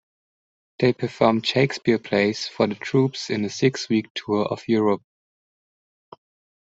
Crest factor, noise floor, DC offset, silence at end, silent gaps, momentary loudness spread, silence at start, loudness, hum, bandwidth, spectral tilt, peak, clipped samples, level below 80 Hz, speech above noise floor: 20 dB; under -90 dBFS; under 0.1%; 1.65 s; 4.10-4.15 s; 4 LU; 0.8 s; -22 LUFS; none; 8 kHz; -5.5 dB/octave; -2 dBFS; under 0.1%; -62 dBFS; over 68 dB